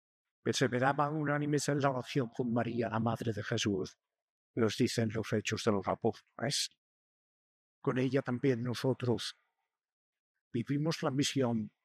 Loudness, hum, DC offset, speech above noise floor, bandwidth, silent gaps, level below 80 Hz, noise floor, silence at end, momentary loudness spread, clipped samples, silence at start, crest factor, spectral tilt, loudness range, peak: -34 LUFS; none; under 0.1%; 52 dB; 15 kHz; 4.22-4.54 s, 6.77-7.82 s, 9.93-10.13 s, 10.19-10.35 s, 10.41-10.51 s; -76 dBFS; -85 dBFS; 0.15 s; 7 LU; under 0.1%; 0.45 s; 18 dB; -5 dB/octave; 3 LU; -16 dBFS